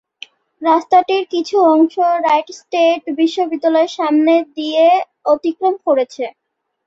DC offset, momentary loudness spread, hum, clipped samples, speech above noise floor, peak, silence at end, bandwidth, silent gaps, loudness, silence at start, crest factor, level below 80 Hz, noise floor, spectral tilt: under 0.1%; 6 LU; none; under 0.1%; 26 dB; -2 dBFS; 0.55 s; 7.8 kHz; none; -15 LUFS; 0.6 s; 14 dB; -66 dBFS; -40 dBFS; -3.5 dB/octave